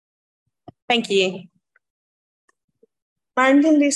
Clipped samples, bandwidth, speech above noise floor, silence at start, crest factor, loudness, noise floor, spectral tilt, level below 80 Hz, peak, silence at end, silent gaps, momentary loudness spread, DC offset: under 0.1%; 11 kHz; over 73 dB; 0.9 s; 18 dB; -18 LUFS; under -90 dBFS; -3.5 dB/octave; -72 dBFS; -4 dBFS; 0 s; 1.90-2.48 s, 2.64-2.68 s, 3.02-3.16 s; 12 LU; under 0.1%